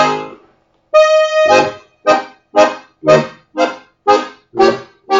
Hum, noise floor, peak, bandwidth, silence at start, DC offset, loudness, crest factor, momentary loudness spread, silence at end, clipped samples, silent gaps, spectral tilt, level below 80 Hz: none; -53 dBFS; 0 dBFS; 7.8 kHz; 0 s; under 0.1%; -13 LUFS; 14 dB; 12 LU; 0 s; under 0.1%; none; -4 dB/octave; -54 dBFS